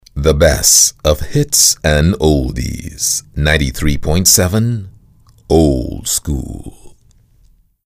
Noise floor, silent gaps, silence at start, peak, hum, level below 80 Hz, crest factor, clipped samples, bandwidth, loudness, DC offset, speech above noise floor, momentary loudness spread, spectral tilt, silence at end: -50 dBFS; none; 0.15 s; 0 dBFS; none; -24 dBFS; 14 dB; under 0.1%; 16 kHz; -12 LUFS; under 0.1%; 37 dB; 14 LU; -3.5 dB/octave; 1 s